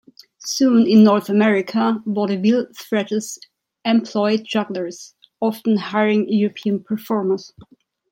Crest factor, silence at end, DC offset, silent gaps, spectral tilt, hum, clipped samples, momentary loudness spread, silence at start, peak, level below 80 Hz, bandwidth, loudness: 16 dB; 0.65 s; under 0.1%; none; -5.5 dB/octave; none; under 0.1%; 13 LU; 0.4 s; -2 dBFS; -68 dBFS; 16.5 kHz; -19 LUFS